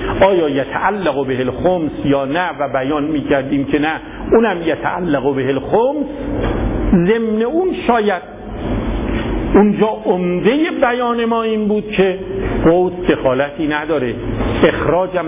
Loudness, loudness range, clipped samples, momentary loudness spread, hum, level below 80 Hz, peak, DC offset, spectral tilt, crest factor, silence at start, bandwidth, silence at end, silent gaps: -16 LUFS; 2 LU; under 0.1%; 7 LU; none; -30 dBFS; -2 dBFS; under 0.1%; -11 dB/octave; 14 dB; 0 s; 3.9 kHz; 0 s; none